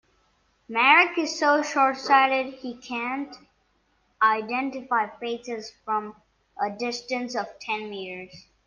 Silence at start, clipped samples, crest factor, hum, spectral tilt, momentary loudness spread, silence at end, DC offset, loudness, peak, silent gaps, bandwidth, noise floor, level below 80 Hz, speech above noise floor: 0.7 s; under 0.1%; 22 dB; none; -2.5 dB/octave; 16 LU; 0.25 s; under 0.1%; -24 LUFS; -4 dBFS; none; 9.6 kHz; -68 dBFS; -70 dBFS; 43 dB